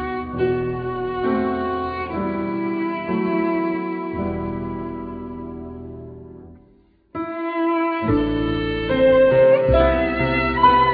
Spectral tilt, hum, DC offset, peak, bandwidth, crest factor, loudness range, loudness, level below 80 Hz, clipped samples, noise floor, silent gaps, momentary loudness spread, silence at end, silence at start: -10 dB/octave; none; under 0.1%; -4 dBFS; 5 kHz; 18 dB; 12 LU; -20 LUFS; -36 dBFS; under 0.1%; -55 dBFS; none; 18 LU; 0 s; 0 s